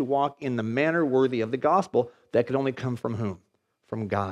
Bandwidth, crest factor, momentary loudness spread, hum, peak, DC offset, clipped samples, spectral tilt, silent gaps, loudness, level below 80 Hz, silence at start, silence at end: 10.5 kHz; 16 dB; 10 LU; none; -10 dBFS; under 0.1%; under 0.1%; -7.5 dB/octave; none; -26 LUFS; -70 dBFS; 0 s; 0 s